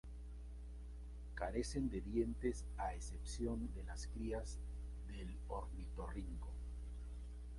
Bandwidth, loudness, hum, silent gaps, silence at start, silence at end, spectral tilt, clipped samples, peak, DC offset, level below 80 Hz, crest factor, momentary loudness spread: 11.5 kHz; -47 LUFS; 60 Hz at -50 dBFS; none; 0.05 s; 0 s; -6 dB/octave; under 0.1%; -26 dBFS; under 0.1%; -48 dBFS; 18 dB; 12 LU